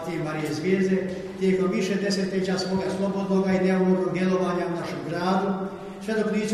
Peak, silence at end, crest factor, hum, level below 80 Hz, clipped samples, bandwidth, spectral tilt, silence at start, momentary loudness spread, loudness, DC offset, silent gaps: -10 dBFS; 0 s; 16 dB; none; -58 dBFS; under 0.1%; 12 kHz; -6.5 dB/octave; 0 s; 7 LU; -25 LUFS; under 0.1%; none